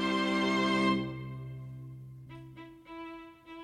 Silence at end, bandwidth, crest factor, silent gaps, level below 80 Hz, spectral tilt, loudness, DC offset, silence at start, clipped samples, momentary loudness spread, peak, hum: 0 s; 12.5 kHz; 18 dB; none; -62 dBFS; -5.5 dB/octave; -30 LUFS; under 0.1%; 0 s; under 0.1%; 21 LU; -16 dBFS; none